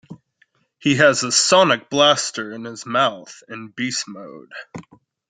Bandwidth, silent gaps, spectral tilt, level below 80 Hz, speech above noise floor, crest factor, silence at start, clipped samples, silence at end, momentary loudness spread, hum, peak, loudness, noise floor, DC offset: 9.6 kHz; none; -2.5 dB/octave; -66 dBFS; 43 dB; 20 dB; 0.1 s; under 0.1%; 0.5 s; 22 LU; none; -2 dBFS; -17 LUFS; -62 dBFS; under 0.1%